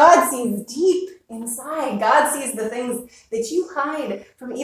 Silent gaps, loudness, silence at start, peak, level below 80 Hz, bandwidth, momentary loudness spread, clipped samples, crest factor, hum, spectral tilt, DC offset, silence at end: none; -21 LUFS; 0 s; 0 dBFS; -64 dBFS; 16 kHz; 14 LU; under 0.1%; 20 dB; none; -3.5 dB/octave; under 0.1%; 0 s